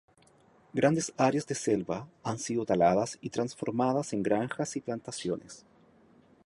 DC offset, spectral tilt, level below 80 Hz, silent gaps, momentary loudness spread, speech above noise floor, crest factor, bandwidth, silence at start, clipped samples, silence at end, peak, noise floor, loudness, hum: under 0.1%; -5.5 dB/octave; -66 dBFS; none; 11 LU; 32 dB; 20 dB; 11.5 kHz; 0.75 s; under 0.1%; 0.9 s; -10 dBFS; -62 dBFS; -30 LUFS; none